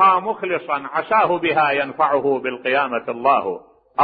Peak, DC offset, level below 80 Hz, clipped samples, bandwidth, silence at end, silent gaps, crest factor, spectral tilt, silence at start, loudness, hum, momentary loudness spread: -2 dBFS; under 0.1%; -62 dBFS; under 0.1%; 4.9 kHz; 0 s; none; 16 dB; -9 dB/octave; 0 s; -19 LUFS; none; 6 LU